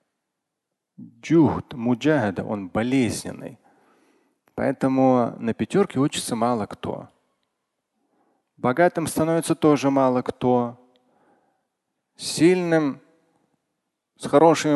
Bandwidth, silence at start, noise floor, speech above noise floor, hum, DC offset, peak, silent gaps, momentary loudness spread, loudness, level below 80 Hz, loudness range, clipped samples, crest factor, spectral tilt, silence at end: 12.5 kHz; 1 s; -82 dBFS; 61 dB; none; under 0.1%; -2 dBFS; none; 14 LU; -22 LUFS; -56 dBFS; 4 LU; under 0.1%; 20 dB; -6 dB/octave; 0 s